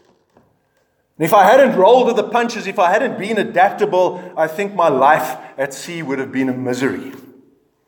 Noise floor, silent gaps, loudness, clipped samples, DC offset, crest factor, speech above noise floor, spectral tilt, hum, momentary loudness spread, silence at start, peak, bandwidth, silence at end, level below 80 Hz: -63 dBFS; none; -15 LUFS; under 0.1%; under 0.1%; 16 dB; 48 dB; -5 dB/octave; none; 14 LU; 1.2 s; 0 dBFS; 19.5 kHz; 0.7 s; -70 dBFS